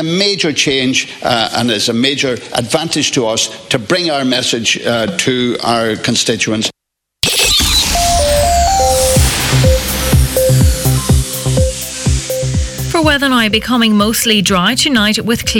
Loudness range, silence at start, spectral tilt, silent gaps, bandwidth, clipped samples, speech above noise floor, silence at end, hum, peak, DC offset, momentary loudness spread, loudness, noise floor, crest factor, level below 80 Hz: 3 LU; 0 s; -3.5 dB/octave; none; 19 kHz; under 0.1%; 62 dB; 0 s; none; 0 dBFS; under 0.1%; 6 LU; -12 LUFS; -75 dBFS; 12 dB; -22 dBFS